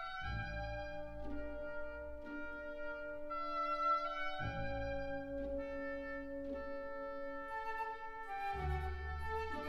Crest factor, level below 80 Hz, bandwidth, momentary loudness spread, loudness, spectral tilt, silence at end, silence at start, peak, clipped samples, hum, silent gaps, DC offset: 16 dB; -50 dBFS; 12 kHz; 9 LU; -43 LUFS; -7 dB/octave; 0 s; 0 s; -26 dBFS; under 0.1%; none; none; under 0.1%